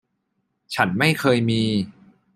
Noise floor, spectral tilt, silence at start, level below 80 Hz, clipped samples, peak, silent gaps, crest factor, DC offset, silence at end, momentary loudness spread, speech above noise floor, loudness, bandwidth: -73 dBFS; -5.5 dB/octave; 0.7 s; -58 dBFS; under 0.1%; -2 dBFS; none; 20 dB; under 0.1%; 0.45 s; 11 LU; 54 dB; -21 LUFS; 16 kHz